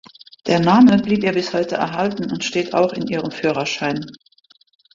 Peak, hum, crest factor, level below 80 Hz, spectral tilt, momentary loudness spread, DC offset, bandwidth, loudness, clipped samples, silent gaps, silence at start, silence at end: -2 dBFS; none; 16 dB; -56 dBFS; -5.5 dB/octave; 12 LU; under 0.1%; 7.6 kHz; -18 LUFS; under 0.1%; none; 0.45 s; 0.85 s